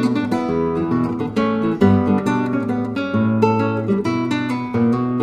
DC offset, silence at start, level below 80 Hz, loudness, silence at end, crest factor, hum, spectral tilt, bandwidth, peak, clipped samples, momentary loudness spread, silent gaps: under 0.1%; 0 s; -50 dBFS; -19 LUFS; 0 s; 16 dB; none; -8 dB/octave; 9.8 kHz; -2 dBFS; under 0.1%; 5 LU; none